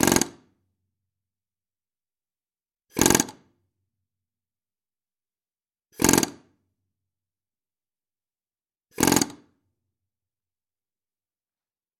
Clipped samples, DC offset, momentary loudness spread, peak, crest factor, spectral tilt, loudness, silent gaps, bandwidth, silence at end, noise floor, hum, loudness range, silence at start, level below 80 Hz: under 0.1%; under 0.1%; 11 LU; 0 dBFS; 30 dB; -3 dB/octave; -22 LUFS; none; 17 kHz; 2.65 s; under -90 dBFS; none; 1 LU; 0 s; -54 dBFS